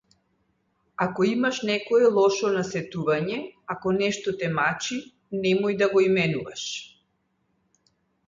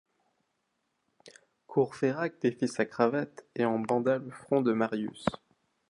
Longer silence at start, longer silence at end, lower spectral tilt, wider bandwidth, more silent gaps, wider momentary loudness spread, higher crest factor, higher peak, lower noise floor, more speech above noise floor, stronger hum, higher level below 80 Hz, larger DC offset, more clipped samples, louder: second, 1 s vs 1.25 s; first, 1.4 s vs 0.55 s; second, -5 dB/octave vs -6.5 dB/octave; second, 7.6 kHz vs 11 kHz; neither; first, 12 LU vs 7 LU; second, 16 dB vs 24 dB; about the same, -8 dBFS vs -8 dBFS; second, -72 dBFS vs -79 dBFS; about the same, 48 dB vs 50 dB; neither; about the same, -64 dBFS vs -66 dBFS; neither; neither; first, -24 LUFS vs -30 LUFS